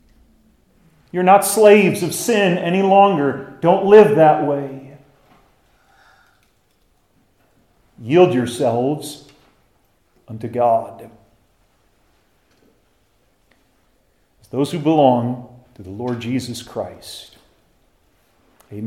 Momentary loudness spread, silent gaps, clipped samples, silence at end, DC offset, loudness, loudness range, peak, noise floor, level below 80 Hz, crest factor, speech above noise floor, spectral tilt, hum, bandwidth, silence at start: 23 LU; none; under 0.1%; 0 s; under 0.1%; -16 LUFS; 13 LU; 0 dBFS; -61 dBFS; -60 dBFS; 18 dB; 46 dB; -5.5 dB/octave; none; 16 kHz; 1.15 s